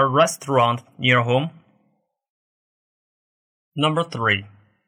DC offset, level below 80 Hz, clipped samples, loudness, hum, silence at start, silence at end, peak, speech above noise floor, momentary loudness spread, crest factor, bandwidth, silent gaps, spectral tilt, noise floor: under 0.1%; -66 dBFS; under 0.1%; -20 LUFS; none; 0 s; 0.4 s; -6 dBFS; 49 dB; 6 LU; 18 dB; 16 kHz; 2.30-3.72 s; -4.5 dB/octave; -68 dBFS